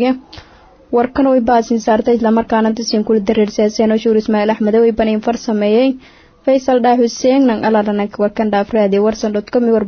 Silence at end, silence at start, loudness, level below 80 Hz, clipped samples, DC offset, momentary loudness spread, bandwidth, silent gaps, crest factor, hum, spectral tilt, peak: 0 s; 0 s; -14 LUFS; -44 dBFS; under 0.1%; under 0.1%; 5 LU; 6.8 kHz; none; 12 dB; none; -6 dB/octave; -2 dBFS